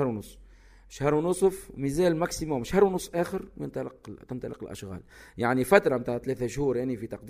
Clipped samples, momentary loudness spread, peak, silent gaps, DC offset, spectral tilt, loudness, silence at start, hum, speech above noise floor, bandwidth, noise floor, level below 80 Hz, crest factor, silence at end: under 0.1%; 18 LU; -4 dBFS; none; under 0.1%; -6 dB/octave; -27 LUFS; 0 s; none; 25 dB; 15.5 kHz; -53 dBFS; -50 dBFS; 24 dB; 0 s